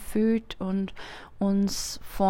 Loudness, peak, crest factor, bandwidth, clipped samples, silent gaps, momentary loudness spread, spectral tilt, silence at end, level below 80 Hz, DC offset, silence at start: -28 LUFS; -12 dBFS; 16 dB; 16 kHz; under 0.1%; none; 12 LU; -5.5 dB/octave; 0 s; -46 dBFS; under 0.1%; 0 s